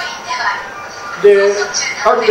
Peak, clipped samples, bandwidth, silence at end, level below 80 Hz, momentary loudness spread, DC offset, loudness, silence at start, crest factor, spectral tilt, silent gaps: 0 dBFS; under 0.1%; 10 kHz; 0 s; -52 dBFS; 16 LU; under 0.1%; -13 LUFS; 0 s; 14 dB; -2 dB/octave; none